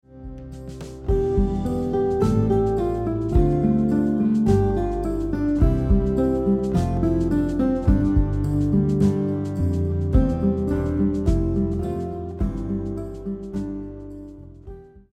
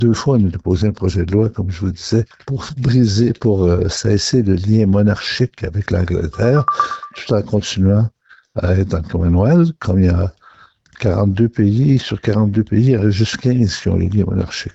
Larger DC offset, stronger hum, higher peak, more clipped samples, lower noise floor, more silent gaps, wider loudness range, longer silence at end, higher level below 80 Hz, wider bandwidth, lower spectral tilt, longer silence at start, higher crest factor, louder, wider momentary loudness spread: neither; neither; second, -8 dBFS vs -2 dBFS; neither; second, -41 dBFS vs -47 dBFS; neither; first, 5 LU vs 2 LU; about the same, 0.15 s vs 0.05 s; first, -28 dBFS vs -38 dBFS; first, 10.5 kHz vs 8.2 kHz; first, -9.5 dB/octave vs -7 dB/octave; about the same, 0.1 s vs 0 s; about the same, 14 dB vs 12 dB; second, -22 LUFS vs -16 LUFS; first, 16 LU vs 7 LU